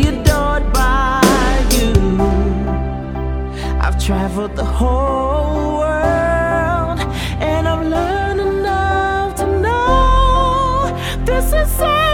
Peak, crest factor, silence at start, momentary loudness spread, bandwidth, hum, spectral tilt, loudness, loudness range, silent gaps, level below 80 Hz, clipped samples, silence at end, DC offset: 0 dBFS; 14 dB; 0 s; 7 LU; 17.5 kHz; none; -5.5 dB/octave; -16 LUFS; 3 LU; none; -20 dBFS; under 0.1%; 0 s; under 0.1%